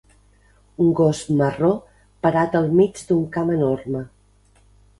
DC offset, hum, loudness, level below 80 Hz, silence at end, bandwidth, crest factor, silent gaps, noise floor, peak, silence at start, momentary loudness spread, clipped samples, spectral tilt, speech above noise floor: under 0.1%; 50 Hz at -50 dBFS; -20 LUFS; -52 dBFS; 0.9 s; 11.5 kHz; 16 dB; none; -56 dBFS; -4 dBFS; 0.8 s; 10 LU; under 0.1%; -7.5 dB/octave; 37 dB